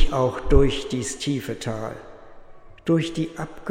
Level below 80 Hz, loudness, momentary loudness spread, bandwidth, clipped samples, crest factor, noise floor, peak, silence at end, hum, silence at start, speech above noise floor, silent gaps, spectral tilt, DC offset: -28 dBFS; -25 LUFS; 13 LU; 15.5 kHz; under 0.1%; 20 dB; -43 dBFS; -2 dBFS; 0 s; none; 0 s; 20 dB; none; -5.5 dB/octave; under 0.1%